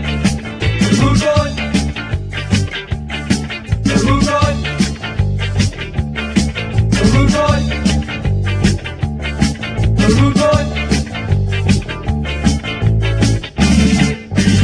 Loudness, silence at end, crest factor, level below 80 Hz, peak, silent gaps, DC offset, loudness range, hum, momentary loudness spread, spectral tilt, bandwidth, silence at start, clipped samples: -15 LUFS; 0 s; 14 dB; -24 dBFS; 0 dBFS; none; under 0.1%; 2 LU; none; 9 LU; -5.5 dB/octave; 10.5 kHz; 0 s; under 0.1%